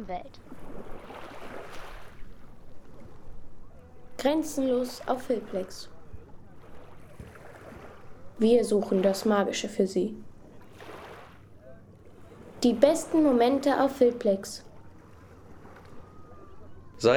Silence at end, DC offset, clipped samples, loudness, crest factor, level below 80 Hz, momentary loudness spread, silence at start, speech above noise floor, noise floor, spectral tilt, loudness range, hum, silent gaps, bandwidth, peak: 0 s; under 0.1%; under 0.1%; -26 LUFS; 24 dB; -54 dBFS; 25 LU; 0 s; 24 dB; -50 dBFS; -5 dB/octave; 14 LU; none; none; 18.5 kHz; -6 dBFS